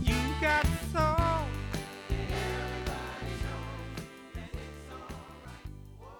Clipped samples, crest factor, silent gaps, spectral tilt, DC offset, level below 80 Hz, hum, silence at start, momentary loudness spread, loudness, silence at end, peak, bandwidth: under 0.1%; 18 dB; none; -5.5 dB/octave; under 0.1%; -38 dBFS; none; 0 s; 18 LU; -33 LUFS; 0 s; -14 dBFS; over 20 kHz